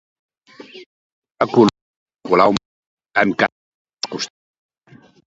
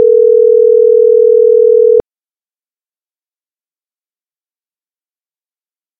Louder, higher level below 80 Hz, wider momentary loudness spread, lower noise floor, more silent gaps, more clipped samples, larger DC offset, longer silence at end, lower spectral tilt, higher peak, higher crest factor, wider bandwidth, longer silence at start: second, -18 LUFS vs -7 LUFS; about the same, -58 dBFS vs -54 dBFS; first, 23 LU vs 1 LU; second, -49 dBFS vs under -90 dBFS; first, 0.86-1.22 s, 1.81-2.06 s, 2.65-2.97 s, 3.52-3.85 s vs none; second, under 0.1% vs 0.1%; neither; second, 1.1 s vs 4 s; second, -5 dB/octave vs -10 dB/octave; about the same, 0 dBFS vs 0 dBFS; first, 22 dB vs 10 dB; first, 7.8 kHz vs 1.3 kHz; first, 0.6 s vs 0 s